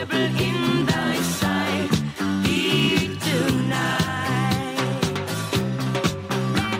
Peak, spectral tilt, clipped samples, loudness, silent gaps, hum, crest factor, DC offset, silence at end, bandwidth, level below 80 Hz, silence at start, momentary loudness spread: -6 dBFS; -5 dB/octave; under 0.1%; -22 LUFS; none; none; 16 dB; under 0.1%; 0 s; 16 kHz; -46 dBFS; 0 s; 5 LU